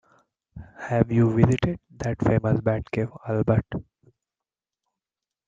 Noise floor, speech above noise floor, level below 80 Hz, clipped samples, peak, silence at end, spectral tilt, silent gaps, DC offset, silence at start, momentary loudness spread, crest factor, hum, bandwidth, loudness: -90 dBFS; 67 dB; -48 dBFS; under 0.1%; -2 dBFS; 1.65 s; -8.5 dB/octave; none; under 0.1%; 0.55 s; 11 LU; 22 dB; none; 7.8 kHz; -24 LUFS